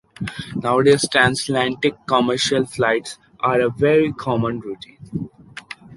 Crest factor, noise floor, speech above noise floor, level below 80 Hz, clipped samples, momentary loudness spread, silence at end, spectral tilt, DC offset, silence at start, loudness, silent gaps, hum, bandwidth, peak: 18 dB; -39 dBFS; 20 dB; -52 dBFS; under 0.1%; 18 LU; 0 s; -4.5 dB/octave; under 0.1%; 0.2 s; -19 LUFS; none; none; 11.5 kHz; -2 dBFS